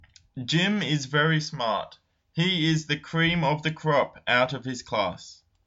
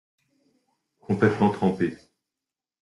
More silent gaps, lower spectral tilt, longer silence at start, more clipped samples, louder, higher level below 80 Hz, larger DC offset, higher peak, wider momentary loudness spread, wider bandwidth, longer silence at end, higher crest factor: neither; second, -5 dB/octave vs -8 dB/octave; second, 0.35 s vs 1.1 s; neither; about the same, -25 LUFS vs -24 LUFS; first, -58 dBFS vs -64 dBFS; neither; about the same, -8 dBFS vs -8 dBFS; first, 11 LU vs 8 LU; second, 7.8 kHz vs 11 kHz; second, 0.35 s vs 0.85 s; about the same, 18 dB vs 20 dB